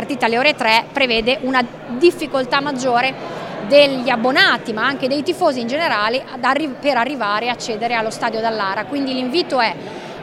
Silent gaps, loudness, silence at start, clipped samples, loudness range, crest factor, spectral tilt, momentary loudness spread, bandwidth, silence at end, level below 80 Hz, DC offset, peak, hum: none; -17 LUFS; 0 s; under 0.1%; 4 LU; 18 dB; -4 dB/octave; 8 LU; 15.5 kHz; 0 s; -52 dBFS; under 0.1%; 0 dBFS; none